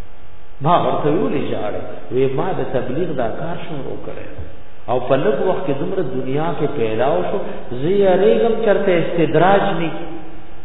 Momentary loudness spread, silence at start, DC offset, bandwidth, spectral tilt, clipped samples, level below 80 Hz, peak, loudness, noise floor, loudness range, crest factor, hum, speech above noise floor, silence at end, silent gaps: 16 LU; 0 s; 10%; 4.1 kHz; -10.5 dB/octave; under 0.1%; -42 dBFS; -2 dBFS; -19 LUFS; -39 dBFS; 7 LU; 18 dB; none; 21 dB; 0 s; none